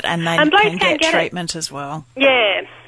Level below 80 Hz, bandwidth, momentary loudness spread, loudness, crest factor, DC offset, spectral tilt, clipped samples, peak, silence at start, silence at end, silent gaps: -54 dBFS; 11 kHz; 12 LU; -15 LUFS; 14 dB; under 0.1%; -3.5 dB/octave; under 0.1%; -2 dBFS; 0 s; 0.15 s; none